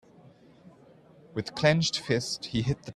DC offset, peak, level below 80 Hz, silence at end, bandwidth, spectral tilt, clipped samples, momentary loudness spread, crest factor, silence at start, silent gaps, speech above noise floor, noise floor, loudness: under 0.1%; -8 dBFS; -56 dBFS; 0.05 s; 12.5 kHz; -4.5 dB/octave; under 0.1%; 12 LU; 24 dB; 0.65 s; none; 28 dB; -56 dBFS; -28 LUFS